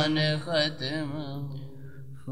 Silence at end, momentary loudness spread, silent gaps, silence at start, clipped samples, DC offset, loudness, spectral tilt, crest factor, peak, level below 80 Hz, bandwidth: 0 s; 19 LU; none; 0 s; under 0.1%; 0.7%; -29 LUFS; -5.5 dB/octave; 18 dB; -12 dBFS; -62 dBFS; 10.5 kHz